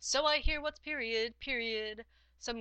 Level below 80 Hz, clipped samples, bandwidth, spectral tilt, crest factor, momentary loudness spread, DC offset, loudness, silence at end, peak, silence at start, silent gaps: -44 dBFS; under 0.1%; 9 kHz; -2 dB/octave; 18 dB; 13 LU; under 0.1%; -34 LUFS; 0 s; -16 dBFS; 0 s; none